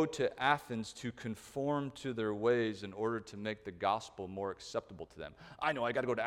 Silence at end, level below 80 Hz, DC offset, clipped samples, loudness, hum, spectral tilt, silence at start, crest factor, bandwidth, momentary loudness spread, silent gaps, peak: 0 s; -68 dBFS; under 0.1%; under 0.1%; -37 LUFS; none; -5.5 dB/octave; 0 s; 22 dB; 16 kHz; 12 LU; none; -14 dBFS